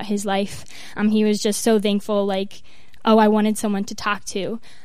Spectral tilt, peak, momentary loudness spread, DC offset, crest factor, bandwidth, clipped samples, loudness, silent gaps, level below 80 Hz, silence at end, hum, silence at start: -5 dB/octave; -4 dBFS; 13 LU; 2%; 18 dB; 15 kHz; under 0.1%; -20 LUFS; none; -56 dBFS; 0.25 s; none; 0 s